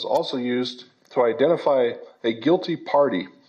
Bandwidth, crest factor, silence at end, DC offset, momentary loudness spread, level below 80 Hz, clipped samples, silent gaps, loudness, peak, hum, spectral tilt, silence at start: 8.6 kHz; 14 dB; 0.2 s; under 0.1%; 8 LU; -78 dBFS; under 0.1%; none; -22 LUFS; -8 dBFS; none; -6.5 dB/octave; 0 s